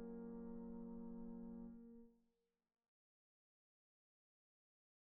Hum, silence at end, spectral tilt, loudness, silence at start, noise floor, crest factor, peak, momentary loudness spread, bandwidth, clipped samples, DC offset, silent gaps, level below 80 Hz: none; 2.8 s; -9.5 dB/octave; -55 LUFS; 0 s; -88 dBFS; 14 dB; -42 dBFS; 8 LU; 2 kHz; under 0.1%; under 0.1%; none; -70 dBFS